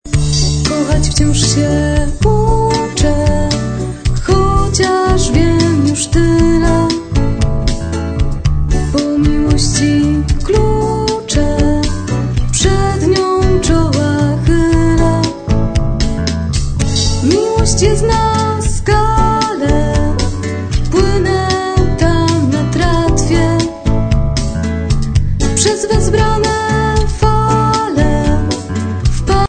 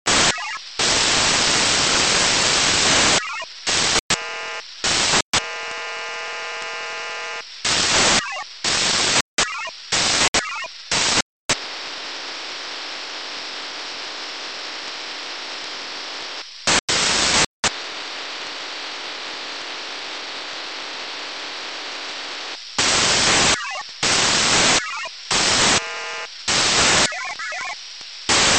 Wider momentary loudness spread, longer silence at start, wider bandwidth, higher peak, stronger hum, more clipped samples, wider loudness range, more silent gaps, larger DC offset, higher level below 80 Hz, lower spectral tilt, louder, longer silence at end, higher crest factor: second, 5 LU vs 14 LU; about the same, 0.05 s vs 0.05 s; about the same, 9.4 kHz vs 9 kHz; first, 0 dBFS vs -4 dBFS; neither; neither; second, 2 LU vs 12 LU; second, none vs 4.00-4.09 s, 5.22-5.33 s, 9.21-9.37 s, 10.28-10.33 s, 11.22-11.49 s, 16.79-16.88 s, 17.46-17.63 s; second, under 0.1% vs 0.3%; first, -18 dBFS vs -46 dBFS; first, -5.5 dB/octave vs -0.5 dB/octave; first, -13 LUFS vs -19 LUFS; about the same, 0 s vs 0 s; about the same, 12 dB vs 16 dB